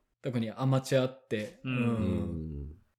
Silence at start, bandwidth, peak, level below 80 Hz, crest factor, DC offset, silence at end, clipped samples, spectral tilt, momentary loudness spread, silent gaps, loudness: 0.25 s; 14.5 kHz; -14 dBFS; -50 dBFS; 18 dB; under 0.1%; 0.25 s; under 0.1%; -7 dB/octave; 10 LU; none; -32 LUFS